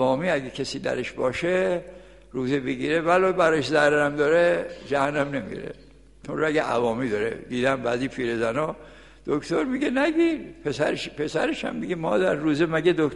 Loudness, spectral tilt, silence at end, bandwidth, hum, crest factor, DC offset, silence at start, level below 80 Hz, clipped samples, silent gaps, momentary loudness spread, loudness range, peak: -24 LUFS; -5.5 dB/octave; 0 s; 11.5 kHz; none; 16 dB; 0.1%; 0 s; -52 dBFS; under 0.1%; none; 11 LU; 4 LU; -8 dBFS